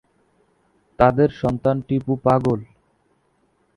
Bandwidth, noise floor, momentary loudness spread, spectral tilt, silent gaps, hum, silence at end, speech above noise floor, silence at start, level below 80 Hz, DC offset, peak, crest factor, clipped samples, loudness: 11 kHz; -64 dBFS; 7 LU; -9 dB/octave; none; none; 1.1 s; 46 dB; 1 s; -46 dBFS; under 0.1%; 0 dBFS; 22 dB; under 0.1%; -20 LUFS